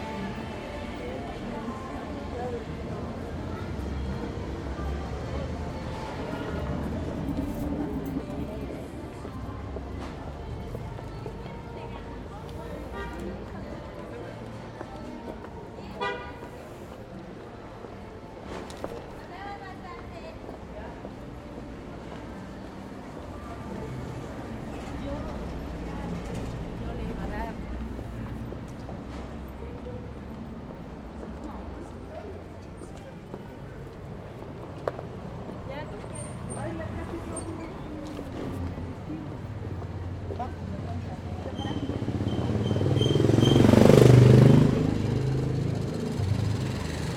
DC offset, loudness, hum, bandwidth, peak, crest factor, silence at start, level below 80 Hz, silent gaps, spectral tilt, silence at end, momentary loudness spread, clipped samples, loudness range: under 0.1%; -30 LUFS; none; 14.5 kHz; -2 dBFS; 28 dB; 0 s; -42 dBFS; none; -7.5 dB/octave; 0 s; 14 LU; under 0.1%; 20 LU